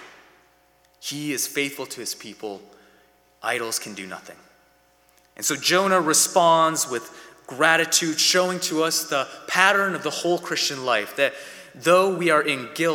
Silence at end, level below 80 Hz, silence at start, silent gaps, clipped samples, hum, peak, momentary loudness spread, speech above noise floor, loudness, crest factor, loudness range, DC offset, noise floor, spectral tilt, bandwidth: 0 s; -74 dBFS; 0 s; none; under 0.1%; none; 0 dBFS; 18 LU; 38 dB; -21 LUFS; 22 dB; 11 LU; under 0.1%; -60 dBFS; -2 dB/octave; 19 kHz